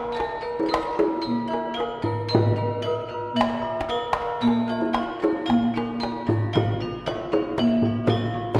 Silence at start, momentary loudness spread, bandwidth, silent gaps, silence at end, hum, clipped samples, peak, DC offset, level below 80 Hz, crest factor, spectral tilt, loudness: 0 s; 6 LU; 9.6 kHz; none; 0 s; none; under 0.1%; -6 dBFS; under 0.1%; -50 dBFS; 18 dB; -7.5 dB/octave; -25 LUFS